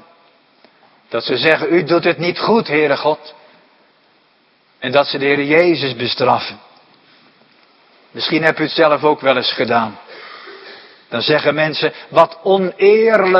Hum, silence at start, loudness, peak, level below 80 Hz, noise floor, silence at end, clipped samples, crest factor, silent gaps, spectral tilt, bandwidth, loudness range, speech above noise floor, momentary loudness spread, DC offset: none; 1.1 s; -15 LUFS; 0 dBFS; -62 dBFS; -56 dBFS; 0 s; under 0.1%; 16 dB; none; -7 dB/octave; 7.2 kHz; 2 LU; 41 dB; 14 LU; under 0.1%